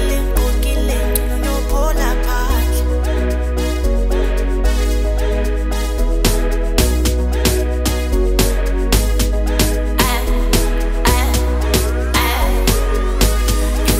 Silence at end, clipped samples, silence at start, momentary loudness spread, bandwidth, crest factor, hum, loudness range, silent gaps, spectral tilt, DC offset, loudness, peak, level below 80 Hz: 0 s; under 0.1%; 0 s; 3 LU; 16.5 kHz; 14 dB; none; 2 LU; none; -4.5 dB/octave; under 0.1%; -17 LUFS; 0 dBFS; -16 dBFS